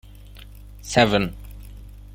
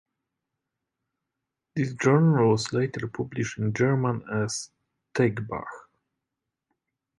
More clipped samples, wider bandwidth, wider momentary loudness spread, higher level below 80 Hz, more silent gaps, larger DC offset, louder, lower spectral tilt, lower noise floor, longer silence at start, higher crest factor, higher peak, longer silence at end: neither; first, 16.5 kHz vs 11.5 kHz; first, 26 LU vs 14 LU; first, -40 dBFS vs -60 dBFS; neither; neither; first, -20 LUFS vs -26 LUFS; second, -4.5 dB/octave vs -6.5 dB/octave; second, -42 dBFS vs -85 dBFS; second, 0.35 s vs 1.75 s; about the same, 24 dB vs 20 dB; first, -2 dBFS vs -6 dBFS; second, 0.15 s vs 1.35 s